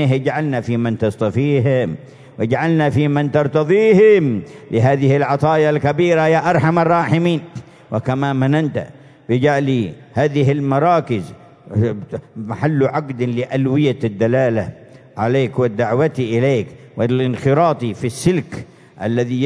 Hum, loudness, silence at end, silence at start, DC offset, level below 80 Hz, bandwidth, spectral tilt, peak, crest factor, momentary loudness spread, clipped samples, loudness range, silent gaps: none; -17 LUFS; 0 s; 0 s; under 0.1%; -54 dBFS; 11 kHz; -7.5 dB/octave; -2 dBFS; 14 dB; 10 LU; under 0.1%; 5 LU; none